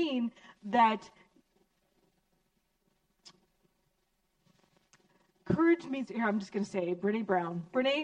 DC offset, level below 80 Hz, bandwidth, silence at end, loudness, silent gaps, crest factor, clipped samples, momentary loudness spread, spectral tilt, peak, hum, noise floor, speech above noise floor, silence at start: under 0.1%; -68 dBFS; 9.2 kHz; 0 s; -31 LUFS; none; 20 dB; under 0.1%; 10 LU; -6.5 dB/octave; -14 dBFS; none; -77 dBFS; 47 dB; 0 s